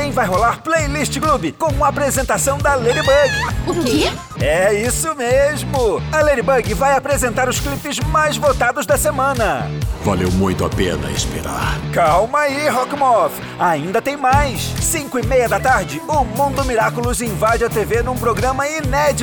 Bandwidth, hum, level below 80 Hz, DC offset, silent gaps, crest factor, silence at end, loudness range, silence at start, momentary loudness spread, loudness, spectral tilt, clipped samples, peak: over 20 kHz; none; -30 dBFS; under 0.1%; none; 14 dB; 0 s; 2 LU; 0 s; 5 LU; -17 LUFS; -4.5 dB/octave; under 0.1%; -2 dBFS